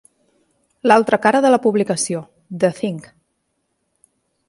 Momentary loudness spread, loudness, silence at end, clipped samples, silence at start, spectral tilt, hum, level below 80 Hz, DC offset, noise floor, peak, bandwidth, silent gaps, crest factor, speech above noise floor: 13 LU; -17 LUFS; 1.5 s; under 0.1%; 0.85 s; -4.5 dB/octave; none; -66 dBFS; under 0.1%; -71 dBFS; 0 dBFS; 11.5 kHz; none; 20 dB; 55 dB